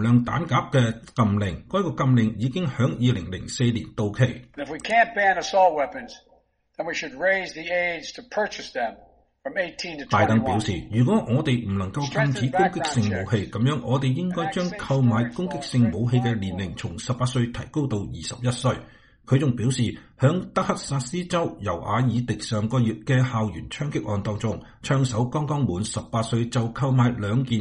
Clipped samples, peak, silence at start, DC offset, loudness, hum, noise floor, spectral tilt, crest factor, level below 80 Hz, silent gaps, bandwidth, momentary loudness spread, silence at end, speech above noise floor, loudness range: under 0.1%; -6 dBFS; 0 s; under 0.1%; -24 LUFS; none; -62 dBFS; -6 dB/octave; 18 dB; -50 dBFS; none; 10.5 kHz; 9 LU; 0 s; 38 dB; 3 LU